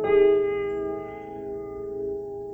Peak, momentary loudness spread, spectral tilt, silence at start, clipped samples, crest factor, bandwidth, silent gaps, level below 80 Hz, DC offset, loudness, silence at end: -10 dBFS; 16 LU; -8 dB/octave; 0 s; under 0.1%; 16 dB; 4 kHz; none; -52 dBFS; under 0.1%; -26 LUFS; 0 s